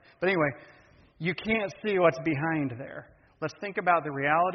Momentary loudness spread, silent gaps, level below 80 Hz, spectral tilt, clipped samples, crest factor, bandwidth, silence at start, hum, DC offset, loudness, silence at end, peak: 14 LU; none; -62 dBFS; -4.5 dB/octave; under 0.1%; 20 dB; 6.2 kHz; 0.2 s; none; under 0.1%; -28 LUFS; 0 s; -10 dBFS